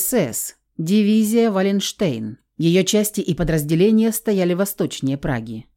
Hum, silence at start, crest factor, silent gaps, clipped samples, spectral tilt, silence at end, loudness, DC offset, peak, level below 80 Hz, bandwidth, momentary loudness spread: none; 0 s; 14 dB; none; under 0.1%; -5 dB/octave; 0.15 s; -19 LUFS; under 0.1%; -6 dBFS; -44 dBFS; 17 kHz; 10 LU